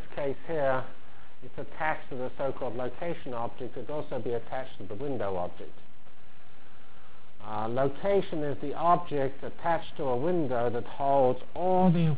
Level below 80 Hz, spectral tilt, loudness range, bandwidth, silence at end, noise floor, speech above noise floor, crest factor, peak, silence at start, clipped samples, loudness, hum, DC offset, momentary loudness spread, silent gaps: -58 dBFS; -10.5 dB/octave; 9 LU; 4 kHz; 0 s; -58 dBFS; 28 dB; 18 dB; -12 dBFS; 0 s; under 0.1%; -31 LUFS; none; 4%; 13 LU; none